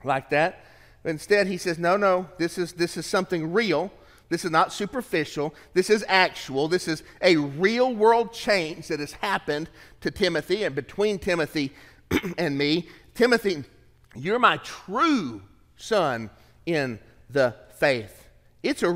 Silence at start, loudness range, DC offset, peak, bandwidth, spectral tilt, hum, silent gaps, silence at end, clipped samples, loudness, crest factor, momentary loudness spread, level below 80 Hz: 0.05 s; 4 LU; under 0.1%; -4 dBFS; 16 kHz; -4.5 dB/octave; none; none; 0 s; under 0.1%; -24 LUFS; 22 dB; 12 LU; -56 dBFS